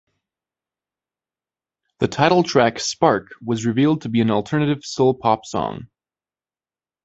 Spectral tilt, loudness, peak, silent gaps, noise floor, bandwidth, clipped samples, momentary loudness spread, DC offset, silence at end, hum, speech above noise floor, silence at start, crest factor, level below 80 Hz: -5.5 dB/octave; -19 LUFS; -2 dBFS; none; under -90 dBFS; 8.2 kHz; under 0.1%; 9 LU; under 0.1%; 1.2 s; none; over 71 dB; 2 s; 20 dB; -56 dBFS